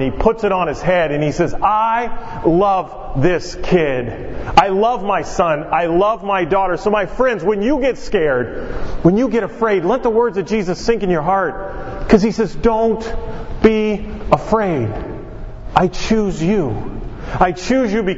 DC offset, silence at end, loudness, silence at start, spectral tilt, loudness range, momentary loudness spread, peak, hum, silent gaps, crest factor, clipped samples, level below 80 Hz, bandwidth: under 0.1%; 0 s; -17 LUFS; 0 s; -6.5 dB/octave; 2 LU; 12 LU; 0 dBFS; none; none; 16 dB; under 0.1%; -30 dBFS; 8 kHz